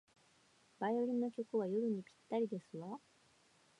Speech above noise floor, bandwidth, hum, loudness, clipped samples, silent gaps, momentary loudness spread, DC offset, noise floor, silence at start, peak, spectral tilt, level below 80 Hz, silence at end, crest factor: 32 dB; 10.5 kHz; none; -40 LUFS; under 0.1%; none; 12 LU; under 0.1%; -71 dBFS; 0.8 s; -26 dBFS; -8 dB/octave; under -90 dBFS; 0.85 s; 16 dB